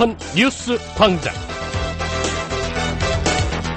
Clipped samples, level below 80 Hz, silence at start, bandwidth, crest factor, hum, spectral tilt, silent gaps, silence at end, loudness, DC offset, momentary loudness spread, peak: under 0.1%; -32 dBFS; 0 s; 9.4 kHz; 18 dB; none; -4.5 dB/octave; none; 0 s; -20 LUFS; under 0.1%; 8 LU; -2 dBFS